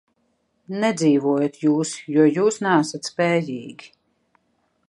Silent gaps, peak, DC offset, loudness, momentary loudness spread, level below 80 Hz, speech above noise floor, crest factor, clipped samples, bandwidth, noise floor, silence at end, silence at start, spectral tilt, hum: none; -4 dBFS; under 0.1%; -20 LUFS; 12 LU; -72 dBFS; 48 dB; 18 dB; under 0.1%; 11.5 kHz; -69 dBFS; 1.05 s; 0.7 s; -5.5 dB/octave; none